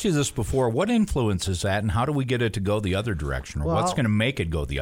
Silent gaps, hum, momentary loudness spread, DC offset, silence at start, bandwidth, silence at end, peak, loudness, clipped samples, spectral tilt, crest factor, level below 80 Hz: none; none; 5 LU; under 0.1%; 0 s; 16.5 kHz; 0 s; -10 dBFS; -25 LUFS; under 0.1%; -5.5 dB/octave; 14 dB; -36 dBFS